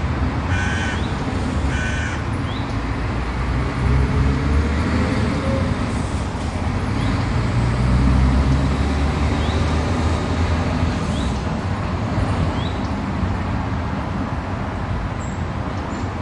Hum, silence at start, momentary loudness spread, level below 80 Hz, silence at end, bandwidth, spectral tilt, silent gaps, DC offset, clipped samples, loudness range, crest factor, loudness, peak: none; 0 s; 6 LU; -26 dBFS; 0 s; 11 kHz; -6.5 dB/octave; none; under 0.1%; under 0.1%; 4 LU; 14 dB; -21 LUFS; -6 dBFS